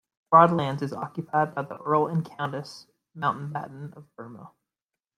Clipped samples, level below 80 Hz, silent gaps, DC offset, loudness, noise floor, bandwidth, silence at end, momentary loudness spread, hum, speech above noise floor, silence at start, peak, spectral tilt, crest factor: under 0.1%; -68 dBFS; none; under 0.1%; -25 LUFS; -89 dBFS; 11 kHz; 0.7 s; 24 LU; none; 63 dB; 0.3 s; -4 dBFS; -7.5 dB/octave; 24 dB